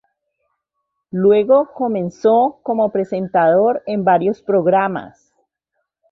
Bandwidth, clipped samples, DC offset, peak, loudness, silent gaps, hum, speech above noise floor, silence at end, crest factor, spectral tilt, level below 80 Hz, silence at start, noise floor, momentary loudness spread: 6.4 kHz; under 0.1%; under 0.1%; -2 dBFS; -16 LUFS; none; none; 60 dB; 1.05 s; 14 dB; -8.5 dB/octave; -60 dBFS; 1.15 s; -76 dBFS; 7 LU